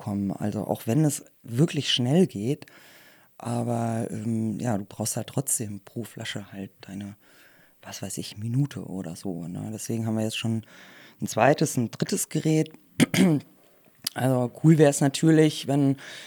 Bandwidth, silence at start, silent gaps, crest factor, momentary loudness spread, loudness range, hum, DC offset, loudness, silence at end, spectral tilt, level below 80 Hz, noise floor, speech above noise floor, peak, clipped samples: over 20 kHz; 0 s; none; 22 dB; 15 LU; 11 LU; none; under 0.1%; -26 LUFS; 0 s; -5.5 dB/octave; -72 dBFS; -58 dBFS; 32 dB; -4 dBFS; under 0.1%